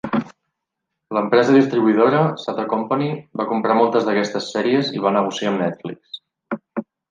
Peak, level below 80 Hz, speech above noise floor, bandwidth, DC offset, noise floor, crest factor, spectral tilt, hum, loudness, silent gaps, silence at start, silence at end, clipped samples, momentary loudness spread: -2 dBFS; -66 dBFS; 62 dB; 9.2 kHz; under 0.1%; -80 dBFS; 18 dB; -6.5 dB/octave; none; -19 LUFS; none; 0.05 s; 0.3 s; under 0.1%; 16 LU